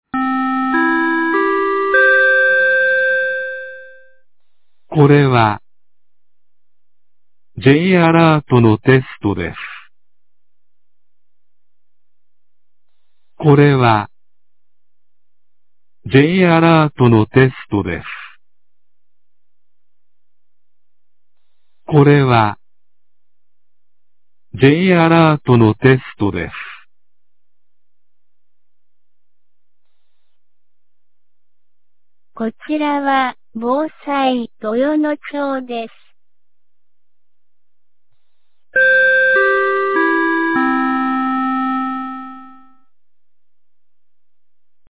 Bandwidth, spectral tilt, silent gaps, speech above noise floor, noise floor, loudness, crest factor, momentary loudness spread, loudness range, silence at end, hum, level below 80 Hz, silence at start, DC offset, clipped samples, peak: 4 kHz; -11 dB/octave; none; 73 dB; -86 dBFS; -14 LUFS; 16 dB; 15 LU; 11 LU; 2.45 s; 50 Hz at -45 dBFS; -48 dBFS; 0.15 s; 0.8%; under 0.1%; 0 dBFS